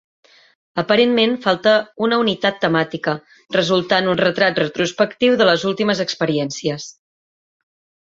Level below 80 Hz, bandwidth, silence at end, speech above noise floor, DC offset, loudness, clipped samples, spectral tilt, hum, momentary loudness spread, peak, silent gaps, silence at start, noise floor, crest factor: -60 dBFS; 7.8 kHz; 1.2 s; over 73 dB; under 0.1%; -18 LUFS; under 0.1%; -4.5 dB/octave; none; 9 LU; 0 dBFS; none; 0.75 s; under -90 dBFS; 18 dB